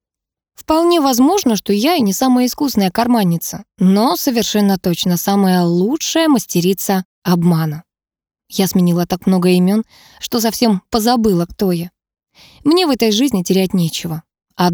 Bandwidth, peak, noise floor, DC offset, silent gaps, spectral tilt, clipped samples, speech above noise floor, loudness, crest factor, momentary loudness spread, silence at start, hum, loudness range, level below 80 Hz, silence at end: over 20 kHz; -2 dBFS; -85 dBFS; under 0.1%; 7.05-7.22 s; -5.5 dB/octave; under 0.1%; 71 dB; -15 LUFS; 14 dB; 8 LU; 0.6 s; none; 2 LU; -48 dBFS; 0 s